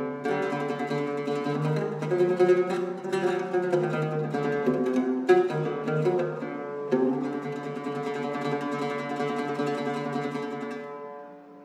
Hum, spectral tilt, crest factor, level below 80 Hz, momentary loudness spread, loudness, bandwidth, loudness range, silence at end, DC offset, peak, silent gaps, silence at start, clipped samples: none; -7 dB/octave; 20 dB; -78 dBFS; 11 LU; -28 LUFS; 11 kHz; 5 LU; 0 s; under 0.1%; -8 dBFS; none; 0 s; under 0.1%